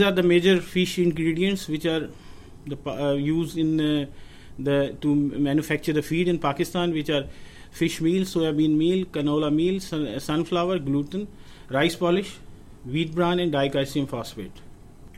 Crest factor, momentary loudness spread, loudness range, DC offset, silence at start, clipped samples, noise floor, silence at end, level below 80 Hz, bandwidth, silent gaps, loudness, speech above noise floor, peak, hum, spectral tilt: 16 dB; 12 LU; 3 LU; under 0.1%; 0 s; under 0.1%; -44 dBFS; 0 s; -48 dBFS; 16 kHz; none; -24 LUFS; 21 dB; -8 dBFS; none; -6 dB/octave